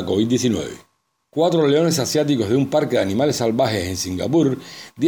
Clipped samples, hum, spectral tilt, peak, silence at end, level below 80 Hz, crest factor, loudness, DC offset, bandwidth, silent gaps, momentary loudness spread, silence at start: under 0.1%; none; -5.5 dB/octave; -6 dBFS; 0 s; -54 dBFS; 14 dB; -19 LUFS; under 0.1%; over 20 kHz; none; 8 LU; 0 s